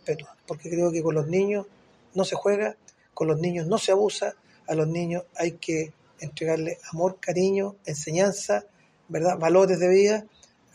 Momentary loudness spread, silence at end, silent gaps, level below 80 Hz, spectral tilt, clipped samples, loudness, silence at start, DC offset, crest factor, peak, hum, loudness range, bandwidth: 13 LU; 0.5 s; none; -66 dBFS; -5.5 dB/octave; under 0.1%; -25 LUFS; 0.05 s; under 0.1%; 18 dB; -8 dBFS; none; 4 LU; 11.5 kHz